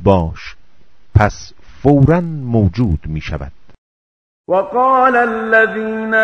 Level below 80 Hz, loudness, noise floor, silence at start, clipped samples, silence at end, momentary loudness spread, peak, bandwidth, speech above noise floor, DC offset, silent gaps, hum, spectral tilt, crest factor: -30 dBFS; -14 LUFS; -53 dBFS; 0 s; 0.2%; 0 s; 15 LU; 0 dBFS; 7 kHz; 39 dB; under 0.1%; 3.78-4.44 s; none; -8 dB/octave; 16 dB